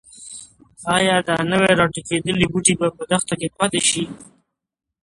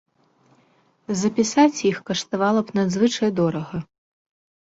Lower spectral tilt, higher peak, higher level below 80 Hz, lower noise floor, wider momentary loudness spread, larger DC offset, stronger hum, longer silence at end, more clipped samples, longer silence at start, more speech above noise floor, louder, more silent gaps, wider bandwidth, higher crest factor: second, -3.5 dB/octave vs -5 dB/octave; first, 0 dBFS vs -4 dBFS; first, -50 dBFS vs -62 dBFS; first, -65 dBFS vs -61 dBFS; first, 16 LU vs 11 LU; neither; neither; about the same, 0.8 s vs 0.85 s; neither; second, 0.15 s vs 1.1 s; first, 45 dB vs 40 dB; first, -18 LUFS vs -21 LUFS; neither; first, 11.5 kHz vs 8 kHz; about the same, 20 dB vs 18 dB